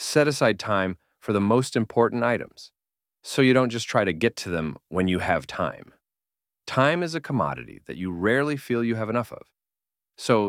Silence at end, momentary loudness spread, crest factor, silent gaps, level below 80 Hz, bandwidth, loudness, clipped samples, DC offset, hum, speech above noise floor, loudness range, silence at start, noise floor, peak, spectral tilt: 0 s; 13 LU; 20 dB; none; -58 dBFS; 16 kHz; -24 LUFS; under 0.1%; under 0.1%; none; over 66 dB; 3 LU; 0 s; under -90 dBFS; -6 dBFS; -5.5 dB/octave